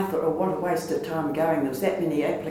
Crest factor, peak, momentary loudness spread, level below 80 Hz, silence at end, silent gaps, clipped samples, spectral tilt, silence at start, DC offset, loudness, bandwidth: 16 dB; -10 dBFS; 3 LU; -58 dBFS; 0 s; none; under 0.1%; -6.5 dB/octave; 0 s; under 0.1%; -26 LUFS; 17.5 kHz